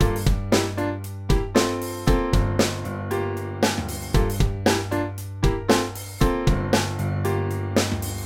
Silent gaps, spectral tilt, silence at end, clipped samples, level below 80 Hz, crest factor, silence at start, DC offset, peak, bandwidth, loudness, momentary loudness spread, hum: none; -5.5 dB/octave; 0 s; under 0.1%; -28 dBFS; 18 dB; 0 s; under 0.1%; -4 dBFS; 17.5 kHz; -24 LUFS; 6 LU; none